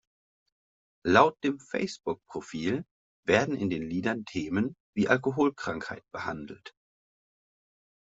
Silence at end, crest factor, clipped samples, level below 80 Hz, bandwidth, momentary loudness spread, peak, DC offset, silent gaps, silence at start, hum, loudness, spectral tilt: 1.45 s; 26 dB; under 0.1%; -64 dBFS; 8 kHz; 13 LU; -4 dBFS; under 0.1%; 2.91-3.23 s, 4.80-4.93 s; 1.05 s; none; -29 LUFS; -5.5 dB/octave